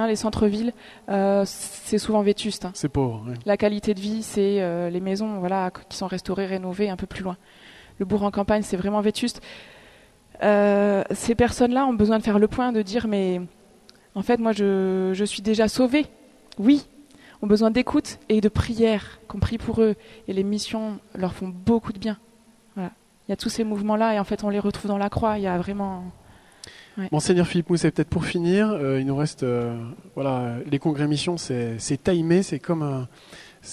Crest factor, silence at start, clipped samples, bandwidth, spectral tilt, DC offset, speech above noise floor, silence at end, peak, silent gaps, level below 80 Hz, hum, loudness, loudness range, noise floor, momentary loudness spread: 18 dB; 0 s; under 0.1%; 13 kHz; -6 dB/octave; under 0.1%; 32 dB; 0 s; -6 dBFS; none; -46 dBFS; none; -24 LUFS; 5 LU; -55 dBFS; 12 LU